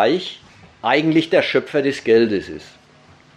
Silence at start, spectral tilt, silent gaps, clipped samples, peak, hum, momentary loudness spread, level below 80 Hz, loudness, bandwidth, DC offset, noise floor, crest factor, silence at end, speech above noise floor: 0 s; -6 dB/octave; none; under 0.1%; -2 dBFS; none; 17 LU; -58 dBFS; -18 LUFS; 10 kHz; under 0.1%; -49 dBFS; 16 dB; 0.7 s; 32 dB